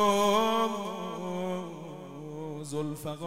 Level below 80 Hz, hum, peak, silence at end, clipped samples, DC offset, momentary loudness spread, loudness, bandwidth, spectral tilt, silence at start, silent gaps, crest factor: -70 dBFS; none; -14 dBFS; 0 s; under 0.1%; under 0.1%; 17 LU; -31 LUFS; 16 kHz; -4.5 dB/octave; 0 s; none; 18 dB